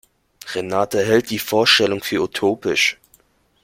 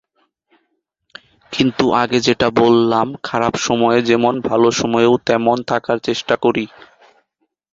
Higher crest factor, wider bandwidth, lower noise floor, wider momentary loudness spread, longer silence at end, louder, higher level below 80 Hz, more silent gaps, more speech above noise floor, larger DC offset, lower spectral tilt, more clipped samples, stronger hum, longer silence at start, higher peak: about the same, 18 dB vs 16 dB; first, 16.5 kHz vs 7.8 kHz; second, -57 dBFS vs -70 dBFS; first, 14 LU vs 6 LU; second, 0.7 s vs 1.1 s; about the same, -18 LUFS vs -16 LUFS; second, -58 dBFS vs -52 dBFS; neither; second, 39 dB vs 54 dB; neither; second, -3 dB/octave vs -5 dB/octave; neither; neither; second, 0.45 s vs 1.5 s; about the same, -2 dBFS vs 0 dBFS